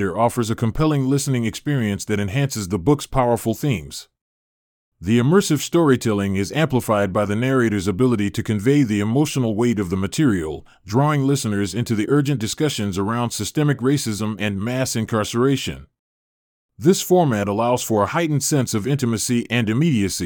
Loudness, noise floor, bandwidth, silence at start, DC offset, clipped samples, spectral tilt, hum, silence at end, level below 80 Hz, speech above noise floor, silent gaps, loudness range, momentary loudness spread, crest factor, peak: -20 LUFS; under -90 dBFS; 19 kHz; 0 s; under 0.1%; under 0.1%; -5.5 dB/octave; none; 0 s; -46 dBFS; over 71 dB; 4.21-4.92 s, 15.99-16.69 s; 3 LU; 6 LU; 18 dB; -2 dBFS